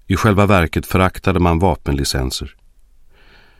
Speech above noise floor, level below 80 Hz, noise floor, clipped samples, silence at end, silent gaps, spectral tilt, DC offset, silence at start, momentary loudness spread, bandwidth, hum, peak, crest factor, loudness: 31 dB; -30 dBFS; -46 dBFS; under 0.1%; 1.1 s; none; -5.5 dB/octave; under 0.1%; 0.1 s; 9 LU; 16 kHz; none; 0 dBFS; 18 dB; -16 LUFS